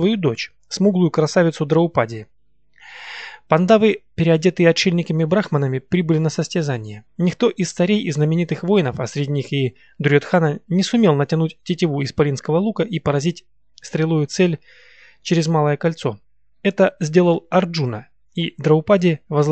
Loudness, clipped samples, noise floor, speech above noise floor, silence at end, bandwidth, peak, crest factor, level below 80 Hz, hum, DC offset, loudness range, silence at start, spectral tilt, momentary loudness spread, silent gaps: -19 LUFS; under 0.1%; -54 dBFS; 36 dB; 0 s; 8.6 kHz; 0 dBFS; 18 dB; -56 dBFS; none; 0.2%; 3 LU; 0 s; -6.5 dB/octave; 11 LU; none